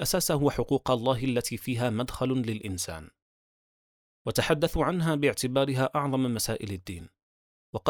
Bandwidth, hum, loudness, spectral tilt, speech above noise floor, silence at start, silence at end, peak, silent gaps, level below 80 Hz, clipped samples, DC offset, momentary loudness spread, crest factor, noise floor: over 20 kHz; none; -28 LUFS; -5 dB/octave; over 62 dB; 0 s; 0 s; -10 dBFS; 3.22-4.25 s, 7.23-7.73 s; -50 dBFS; under 0.1%; under 0.1%; 11 LU; 20 dB; under -90 dBFS